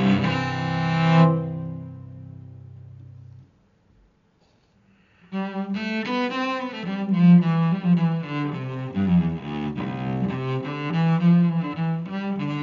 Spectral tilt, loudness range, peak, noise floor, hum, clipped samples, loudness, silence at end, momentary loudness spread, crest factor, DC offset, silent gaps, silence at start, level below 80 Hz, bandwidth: -7 dB/octave; 14 LU; -4 dBFS; -62 dBFS; none; under 0.1%; -23 LUFS; 0 s; 22 LU; 18 dB; under 0.1%; none; 0 s; -56 dBFS; 6.8 kHz